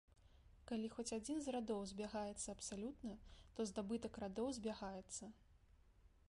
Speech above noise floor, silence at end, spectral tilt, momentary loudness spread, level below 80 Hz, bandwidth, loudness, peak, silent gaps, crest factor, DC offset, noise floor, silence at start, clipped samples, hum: 23 dB; 0.1 s; -4.5 dB/octave; 9 LU; -68 dBFS; 11.5 kHz; -47 LUFS; -32 dBFS; none; 16 dB; under 0.1%; -70 dBFS; 0.1 s; under 0.1%; none